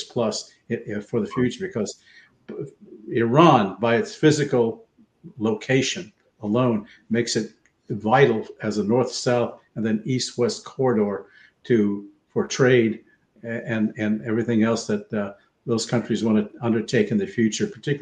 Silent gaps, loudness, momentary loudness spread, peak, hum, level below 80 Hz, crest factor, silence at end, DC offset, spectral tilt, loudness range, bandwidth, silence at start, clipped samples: none; -23 LUFS; 15 LU; 0 dBFS; none; -64 dBFS; 22 dB; 0 s; under 0.1%; -5.5 dB/octave; 4 LU; 9.6 kHz; 0 s; under 0.1%